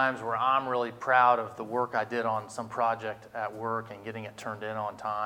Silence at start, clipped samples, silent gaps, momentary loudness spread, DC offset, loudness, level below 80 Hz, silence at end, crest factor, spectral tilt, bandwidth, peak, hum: 0 s; under 0.1%; none; 14 LU; under 0.1%; -29 LUFS; -72 dBFS; 0 s; 20 dB; -5 dB/octave; 16 kHz; -10 dBFS; none